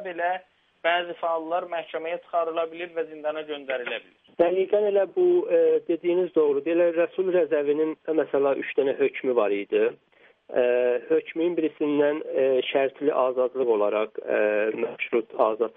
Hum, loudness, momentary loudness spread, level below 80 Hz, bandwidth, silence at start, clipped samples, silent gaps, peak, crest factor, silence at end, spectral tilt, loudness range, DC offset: none; -25 LUFS; 8 LU; -76 dBFS; 3.9 kHz; 0 s; under 0.1%; none; -8 dBFS; 16 dB; 0.05 s; -8.5 dB/octave; 6 LU; under 0.1%